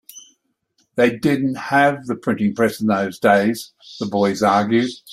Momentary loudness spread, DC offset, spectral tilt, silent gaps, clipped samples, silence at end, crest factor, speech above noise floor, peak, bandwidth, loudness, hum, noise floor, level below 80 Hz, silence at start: 9 LU; under 0.1%; -6 dB/octave; none; under 0.1%; 0 s; 18 dB; 48 dB; -2 dBFS; 15.5 kHz; -18 LUFS; none; -66 dBFS; -58 dBFS; 0.15 s